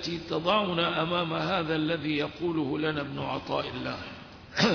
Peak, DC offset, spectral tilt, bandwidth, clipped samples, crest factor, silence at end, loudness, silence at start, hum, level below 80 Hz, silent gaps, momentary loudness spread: -10 dBFS; under 0.1%; -5.5 dB/octave; 5.4 kHz; under 0.1%; 18 dB; 0 s; -29 LUFS; 0 s; none; -58 dBFS; none; 9 LU